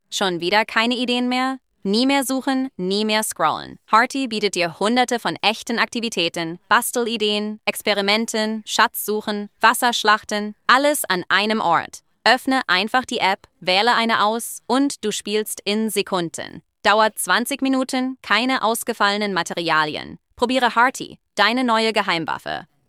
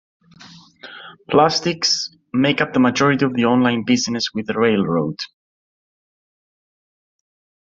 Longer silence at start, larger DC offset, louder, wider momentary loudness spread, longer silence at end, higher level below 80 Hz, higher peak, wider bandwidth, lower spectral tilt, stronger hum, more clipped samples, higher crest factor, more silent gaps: second, 0.1 s vs 0.4 s; neither; about the same, -20 LUFS vs -18 LUFS; second, 8 LU vs 16 LU; second, 0.25 s vs 2.45 s; second, -64 dBFS vs -58 dBFS; about the same, -2 dBFS vs -2 dBFS; first, 16.5 kHz vs 7.8 kHz; second, -2.5 dB/octave vs -4.5 dB/octave; neither; neither; about the same, 18 dB vs 18 dB; neither